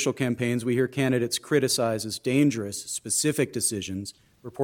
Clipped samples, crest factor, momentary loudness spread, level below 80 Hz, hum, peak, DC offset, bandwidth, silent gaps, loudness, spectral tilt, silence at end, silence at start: under 0.1%; 18 dB; 11 LU; -64 dBFS; none; -8 dBFS; under 0.1%; 17.5 kHz; none; -26 LUFS; -4 dB/octave; 0 s; 0 s